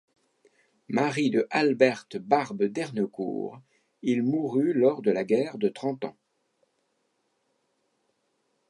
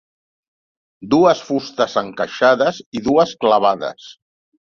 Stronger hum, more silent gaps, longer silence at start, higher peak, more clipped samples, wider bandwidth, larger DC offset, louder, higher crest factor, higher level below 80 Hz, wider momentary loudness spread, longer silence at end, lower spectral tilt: neither; second, none vs 2.86-2.92 s; about the same, 0.9 s vs 1 s; second, -6 dBFS vs -2 dBFS; neither; first, 11.5 kHz vs 7.2 kHz; neither; second, -26 LUFS vs -17 LUFS; first, 22 dB vs 16 dB; second, -80 dBFS vs -58 dBFS; about the same, 11 LU vs 10 LU; first, 2.6 s vs 0.55 s; first, -6.5 dB/octave vs -5 dB/octave